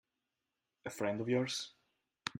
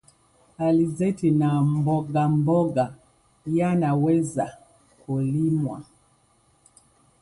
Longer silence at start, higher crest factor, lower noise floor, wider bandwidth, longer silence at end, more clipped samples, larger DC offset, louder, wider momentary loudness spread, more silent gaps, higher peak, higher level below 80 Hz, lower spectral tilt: first, 0.85 s vs 0.6 s; first, 26 dB vs 14 dB; first, -89 dBFS vs -62 dBFS; first, 15.5 kHz vs 11.5 kHz; second, 0.1 s vs 1.4 s; neither; neither; second, -37 LUFS vs -23 LUFS; first, 14 LU vs 9 LU; neither; second, -14 dBFS vs -10 dBFS; second, -80 dBFS vs -58 dBFS; second, -4.5 dB/octave vs -8.5 dB/octave